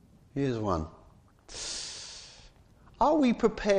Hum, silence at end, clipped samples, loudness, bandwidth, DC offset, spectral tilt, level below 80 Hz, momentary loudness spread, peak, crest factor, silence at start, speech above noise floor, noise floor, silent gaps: none; 0 s; under 0.1%; -30 LUFS; 10.5 kHz; under 0.1%; -5 dB/octave; -50 dBFS; 20 LU; -12 dBFS; 20 dB; 0.35 s; 32 dB; -58 dBFS; none